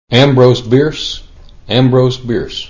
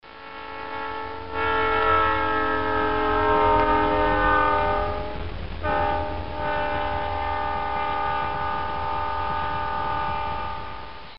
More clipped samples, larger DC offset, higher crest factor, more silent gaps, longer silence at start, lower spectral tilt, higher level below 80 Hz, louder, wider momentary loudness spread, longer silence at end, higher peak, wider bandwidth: first, 0.3% vs under 0.1%; second, under 0.1% vs 2%; second, 12 dB vs 18 dB; neither; about the same, 0.1 s vs 0 s; first, -6.5 dB/octave vs -3 dB/octave; about the same, -36 dBFS vs -38 dBFS; first, -11 LUFS vs -24 LUFS; about the same, 12 LU vs 13 LU; about the same, 0 s vs 0 s; first, 0 dBFS vs -6 dBFS; first, 7.4 kHz vs 5.8 kHz